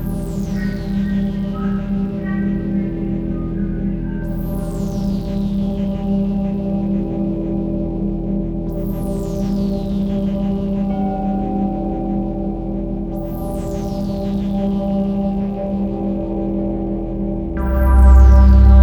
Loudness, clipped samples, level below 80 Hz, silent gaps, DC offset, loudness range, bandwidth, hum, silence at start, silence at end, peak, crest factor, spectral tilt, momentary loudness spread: -19 LUFS; under 0.1%; -20 dBFS; none; under 0.1%; 2 LU; 6.4 kHz; none; 0 s; 0 s; 0 dBFS; 16 dB; -9.5 dB/octave; 5 LU